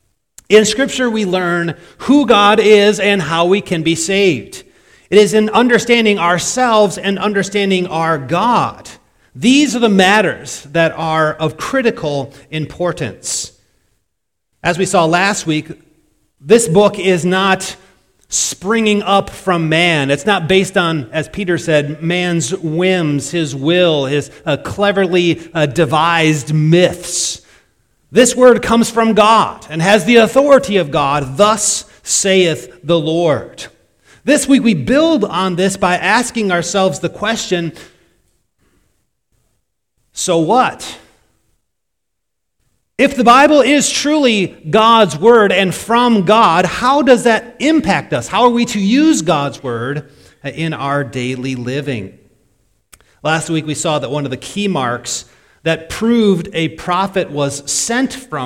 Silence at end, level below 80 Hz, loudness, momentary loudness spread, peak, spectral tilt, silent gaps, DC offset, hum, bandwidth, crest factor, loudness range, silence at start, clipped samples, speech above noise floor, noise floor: 0 s; -46 dBFS; -13 LUFS; 11 LU; 0 dBFS; -4 dB/octave; none; under 0.1%; none; 16.5 kHz; 14 dB; 9 LU; 0.5 s; 0.3%; 63 dB; -76 dBFS